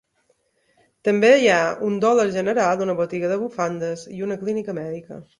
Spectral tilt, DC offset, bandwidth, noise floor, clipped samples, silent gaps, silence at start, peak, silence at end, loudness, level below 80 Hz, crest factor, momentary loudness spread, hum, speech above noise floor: -5 dB/octave; under 0.1%; 11 kHz; -66 dBFS; under 0.1%; none; 1.05 s; -4 dBFS; 0.15 s; -21 LUFS; -64 dBFS; 18 dB; 14 LU; none; 46 dB